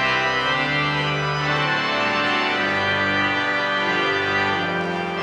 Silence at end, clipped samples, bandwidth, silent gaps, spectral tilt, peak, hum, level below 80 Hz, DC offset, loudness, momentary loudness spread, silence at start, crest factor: 0 s; under 0.1%; 11 kHz; none; -4.5 dB/octave; -8 dBFS; none; -52 dBFS; under 0.1%; -20 LUFS; 3 LU; 0 s; 14 dB